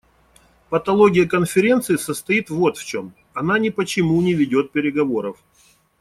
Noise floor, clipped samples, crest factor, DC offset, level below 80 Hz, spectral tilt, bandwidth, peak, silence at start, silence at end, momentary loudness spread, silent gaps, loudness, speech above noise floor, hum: -57 dBFS; under 0.1%; 18 dB; under 0.1%; -54 dBFS; -5.5 dB/octave; 15.5 kHz; -2 dBFS; 0.7 s; 0.65 s; 11 LU; none; -19 LUFS; 38 dB; none